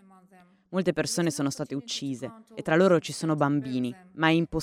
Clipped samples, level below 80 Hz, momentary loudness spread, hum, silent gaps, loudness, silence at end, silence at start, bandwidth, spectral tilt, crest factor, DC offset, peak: under 0.1%; -56 dBFS; 12 LU; none; none; -27 LUFS; 0 s; 0.7 s; 16 kHz; -5 dB/octave; 18 dB; under 0.1%; -8 dBFS